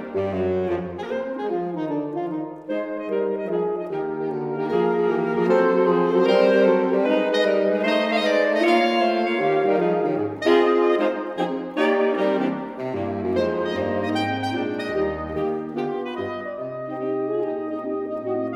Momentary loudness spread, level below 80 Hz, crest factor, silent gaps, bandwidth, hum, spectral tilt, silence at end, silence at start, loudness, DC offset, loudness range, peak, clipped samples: 10 LU; -56 dBFS; 16 dB; none; 11 kHz; none; -6.5 dB/octave; 0 s; 0 s; -22 LUFS; under 0.1%; 8 LU; -6 dBFS; under 0.1%